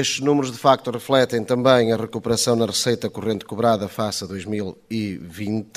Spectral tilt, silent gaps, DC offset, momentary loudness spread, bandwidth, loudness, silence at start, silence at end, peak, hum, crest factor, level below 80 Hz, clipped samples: -4.5 dB/octave; none; under 0.1%; 11 LU; 15.5 kHz; -21 LUFS; 0 s; 0.15 s; 0 dBFS; none; 20 dB; -56 dBFS; under 0.1%